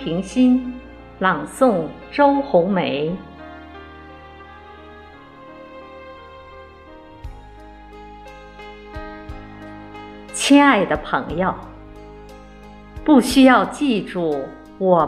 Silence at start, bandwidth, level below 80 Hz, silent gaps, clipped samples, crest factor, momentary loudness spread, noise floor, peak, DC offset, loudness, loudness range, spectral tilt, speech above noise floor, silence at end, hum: 0 s; 14 kHz; -44 dBFS; none; under 0.1%; 20 dB; 27 LU; -42 dBFS; -2 dBFS; under 0.1%; -17 LUFS; 22 LU; -5 dB/octave; 25 dB; 0 s; none